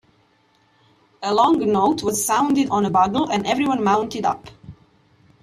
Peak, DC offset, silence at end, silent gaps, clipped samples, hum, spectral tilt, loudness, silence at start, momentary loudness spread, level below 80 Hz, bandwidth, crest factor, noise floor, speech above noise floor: -4 dBFS; under 0.1%; 0.7 s; none; under 0.1%; none; -4.5 dB/octave; -19 LUFS; 1.2 s; 7 LU; -56 dBFS; 15 kHz; 18 dB; -60 dBFS; 41 dB